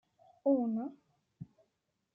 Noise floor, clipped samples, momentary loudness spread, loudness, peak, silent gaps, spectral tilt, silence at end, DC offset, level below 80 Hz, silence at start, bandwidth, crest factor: -82 dBFS; under 0.1%; 23 LU; -34 LUFS; -20 dBFS; none; -11.5 dB/octave; 0.7 s; under 0.1%; -84 dBFS; 0.45 s; 1.7 kHz; 18 dB